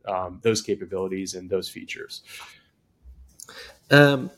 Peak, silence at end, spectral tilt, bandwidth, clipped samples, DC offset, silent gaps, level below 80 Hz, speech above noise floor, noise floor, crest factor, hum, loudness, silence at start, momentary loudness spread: 0 dBFS; 0.1 s; -5 dB/octave; 15.5 kHz; under 0.1%; under 0.1%; none; -58 dBFS; 30 dB; -54 dBFS; 24 dB; none; -23 LUFS; 0.05 s; 25 LU